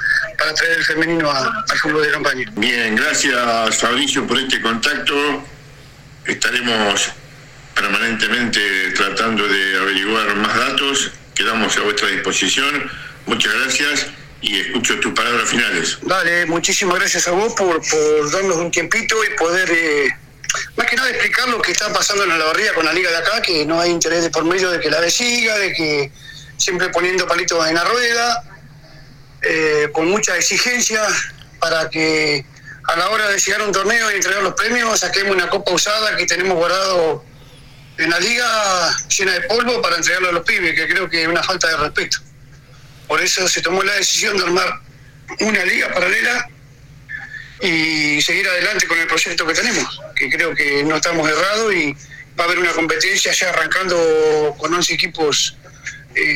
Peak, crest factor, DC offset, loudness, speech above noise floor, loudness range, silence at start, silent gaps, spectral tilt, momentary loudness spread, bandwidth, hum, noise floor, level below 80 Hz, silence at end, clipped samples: 0 dBFS; 18 dB; under 0.1%; -16 LUFS; 25 dB; 2 LU; 0 s; none; -1.5 dB/octave; 6 LU; 17 kHz; none; -42 dBFS; -48 dBFS; 0 s; under 0.1%